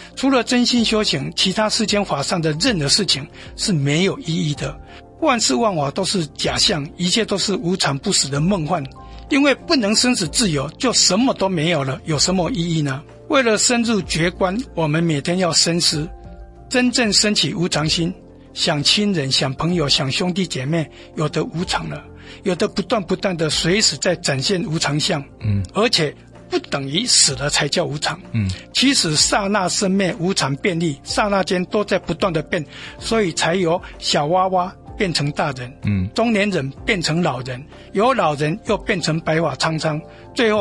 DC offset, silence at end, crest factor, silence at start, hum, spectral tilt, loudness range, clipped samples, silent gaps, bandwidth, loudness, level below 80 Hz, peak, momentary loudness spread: under 0.1%; 0 s; 18 dB; 0 s; none; -3.5 dB/octave; 3 LU; under 0.1%; none; 11.5 kHz; -18 LUFS; -44 dBFS; 0 dBFS; 9 LU